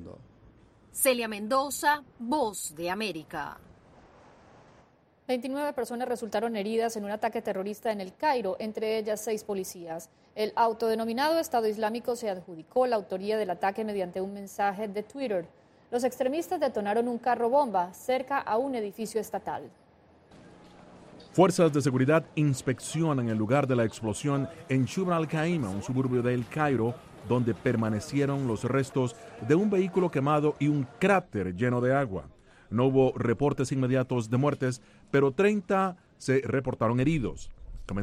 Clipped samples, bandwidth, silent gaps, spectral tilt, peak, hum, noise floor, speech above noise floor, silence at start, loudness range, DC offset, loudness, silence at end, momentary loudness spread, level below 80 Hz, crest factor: under 0.1%; 16 kHz; none; -6 dB/octave; -8 dBFS; none; -61 dBFS; 34 dB; 0 s; 6 LU; under 0.1%; -28 LUFS; 0 s; 10 LU; -56 dBFS; 20 dB